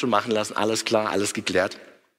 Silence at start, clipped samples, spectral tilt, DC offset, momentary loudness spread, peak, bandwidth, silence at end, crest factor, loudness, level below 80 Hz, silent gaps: 0 s; under 0.1%; -3.5 dB/octave; under 0.1%; 4 LU; -6 dBFS; 16 kHz; 0.35 s; 20 dB; -24 LUFS; -64 dBFS; none